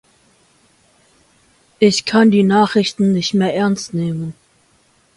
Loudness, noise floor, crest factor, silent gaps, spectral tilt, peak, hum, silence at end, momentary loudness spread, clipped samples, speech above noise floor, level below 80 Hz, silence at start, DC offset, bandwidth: -15 LUFS; -56 dBFS; 16 dB; none; -5.5 dB/octave; 0 dBFS; none; 0.85 s; 10 LU; under 0.1%; 42 dB; -58 dBFS; 1.8 s; under 0.1%; 11.5 kHz